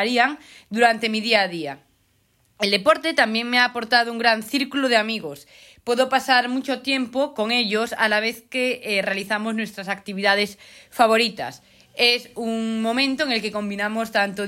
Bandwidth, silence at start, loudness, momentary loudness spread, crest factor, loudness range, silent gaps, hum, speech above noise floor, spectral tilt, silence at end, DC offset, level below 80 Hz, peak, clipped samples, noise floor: 16.5 kHz; 0 s; -21 LUFS; 11 LU; 18 dB; 2 LU; none; none; 42 dB; -3.5 dB/octave; 0 s; under 0.1%; -66 dBFS; -4 dBFS; under 0.1%; -64 dBFS